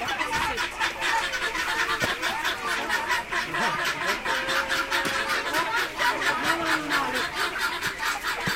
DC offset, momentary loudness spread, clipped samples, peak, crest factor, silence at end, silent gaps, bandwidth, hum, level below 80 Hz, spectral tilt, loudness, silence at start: under 0.1%; 3 LU; under 0.1%; -8 dBFS; 18 dB; 0 s; none; 16 kHz; none; -50 dBFS; -1.5 dB/octave; -25 LUFS; 0 s